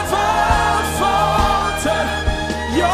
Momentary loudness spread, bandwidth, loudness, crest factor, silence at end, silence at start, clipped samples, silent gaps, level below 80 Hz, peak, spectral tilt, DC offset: 5 LU; 16 kHz; -17 LUFS; 16 dB; 0 s; 0 s; under 0.1%; none; -26 dBFS; -2 dBFS; -4 dB/octave; under 0.1%